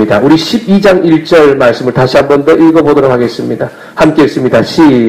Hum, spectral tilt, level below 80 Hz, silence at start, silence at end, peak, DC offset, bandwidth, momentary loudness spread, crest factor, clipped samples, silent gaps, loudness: none; -6.5 dB/octave; -40 dBFS; 0 s; 0 s; 0 dBFS; under 0.1%; 14.5 kHz; 7 LU; 6 dB; 2%; none; -7 LUFS